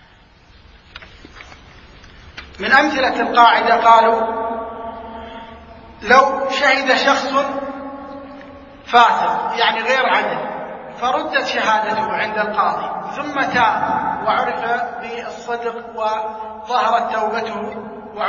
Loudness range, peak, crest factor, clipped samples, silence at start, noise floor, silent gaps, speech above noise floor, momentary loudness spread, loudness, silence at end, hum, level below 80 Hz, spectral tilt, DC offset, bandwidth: 6 LU; 0 dBFS; 18 dB; under 0.1%; 0.95 s; -48 dBFS; none; 32 dB; 20 LU; -17 LUFS; 0 s; none; -50 dBFS; -3.5 dB/octave; under 0.1%; 7.4 kHz